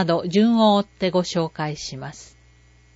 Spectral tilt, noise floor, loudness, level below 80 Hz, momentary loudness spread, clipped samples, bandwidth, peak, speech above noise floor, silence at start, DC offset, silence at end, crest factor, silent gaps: -6 dB/octave; -53 dBFS; -20 LUFS; -54 dBFS; 16 LU; under 0.1%; 8 kHz; -6 dBFS; 32 dB; 0 s; under 0.1%; 0.7 s; 14 dB; none